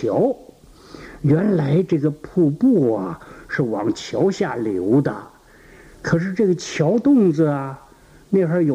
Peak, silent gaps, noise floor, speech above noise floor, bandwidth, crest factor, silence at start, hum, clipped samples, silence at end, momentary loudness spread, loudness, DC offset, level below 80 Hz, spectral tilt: -6 dBFS; none; -47 dBFS; 29 dB; 10.5 kHz; 14 dB; 0 s; none; under 0.1%; 0 s; 15 LU; -19 LUFS; under 0.1%; -52 dBFS; -7.5 dB/octave